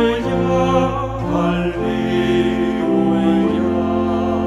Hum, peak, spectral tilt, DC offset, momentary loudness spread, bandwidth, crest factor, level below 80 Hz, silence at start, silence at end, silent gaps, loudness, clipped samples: none; -2 dBFS; -7.5 dB/octave; under 0.1%; 4 LU; 11.5 kHz; 14 dB; -36 dBFS; 0 s; 0 s; none; -17 LUFS; under 0.1%